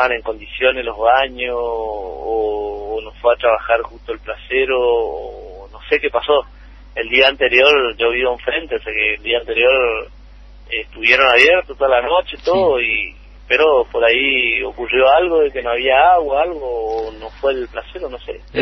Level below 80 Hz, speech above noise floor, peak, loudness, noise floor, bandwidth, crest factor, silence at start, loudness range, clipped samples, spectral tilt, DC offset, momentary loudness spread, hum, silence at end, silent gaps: -40 dBFS; 23 dB; 0 dBFS; -15 LUFS; -39 dBFS; 8 kHz; 16 dB; 0 s; 5 LU; under 0.1%; -4 dB/octave; under 0.1%; 15 LU; none; 0 s; none